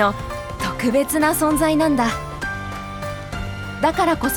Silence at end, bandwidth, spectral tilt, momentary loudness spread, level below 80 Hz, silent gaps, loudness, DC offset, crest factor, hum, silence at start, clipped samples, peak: 0 s; over 20 kHz; -4.5 dB/octave; 12 LU; -38 dBFS; none; -21 LUFS; under 0.1%; 18 dB; none; 0 s; under 0.1%; -2 dBFS